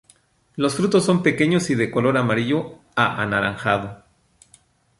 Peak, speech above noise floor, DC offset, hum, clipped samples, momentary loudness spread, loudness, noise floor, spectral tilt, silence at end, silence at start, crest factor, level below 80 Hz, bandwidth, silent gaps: -2 dBFS; 38 dB; under 0.1%; none; under 0.1%; 7 LU; -20 LUFS; -58 dBFS; -5.5 dB/octave; 1.05 s; 0.55 s; 20 dB; -54 dBFS; 11.5 kHz; none